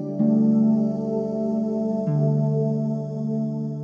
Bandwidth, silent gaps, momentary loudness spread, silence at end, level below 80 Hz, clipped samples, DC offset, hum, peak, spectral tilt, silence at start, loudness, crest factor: 5.6 kHz; none; 8 LU; 0 s; -60 dBFS; under 0.1%; under 0.1%; none; -10 dBFS; -11.5 dB/octave; 0 s; -23 LUFS; 12 dB